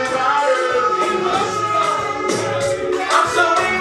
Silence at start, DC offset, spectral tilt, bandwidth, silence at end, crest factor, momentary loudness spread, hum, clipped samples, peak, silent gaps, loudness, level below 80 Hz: 0 s; under 0.1%; -3.5 dB/octave; 14 kHz; 0 s; 16 dB; 5 LU; none; under 0.1%; -2 dBFS; none; -17 LUFS; -52 dBFS